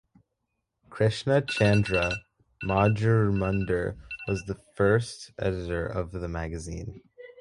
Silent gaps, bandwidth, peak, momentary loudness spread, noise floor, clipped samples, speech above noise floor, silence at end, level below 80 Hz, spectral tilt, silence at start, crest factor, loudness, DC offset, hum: none; 11 kHz; -8 dBFS; 14 LU; -80 dBFS; under 0.1%; 54 dB; 0.1 s; -44 dBFS; -6.5 dB/octave; 0.9 s; 20 dB; -27 LUFS; under 0.1%; none